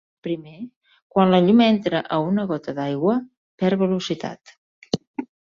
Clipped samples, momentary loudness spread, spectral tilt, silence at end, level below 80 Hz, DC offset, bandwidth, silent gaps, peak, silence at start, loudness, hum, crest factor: under 0.1%; 18 LU; -7 dB/octave; 0.35 s; -62 dBFS; under 0.1%; 7.4 kHz; 0.76-0.81 s, 1.02-1.10 s, 3.37-3.58 s, 4.57-4.82 s, 5.07-5.14 s; -2 dBFS; 0.25 s; -21 LUFS; none; 18 dB